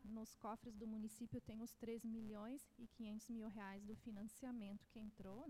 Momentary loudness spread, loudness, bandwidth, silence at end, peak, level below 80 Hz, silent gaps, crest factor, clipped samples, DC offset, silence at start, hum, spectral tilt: 5 LU; -54 LUFS; 16 kHz; 0 s; -38 dBFS; -72 dBFS; none; 14 dB; under 0.1%; under 0.1%; 0 s; none; -6 dB/octave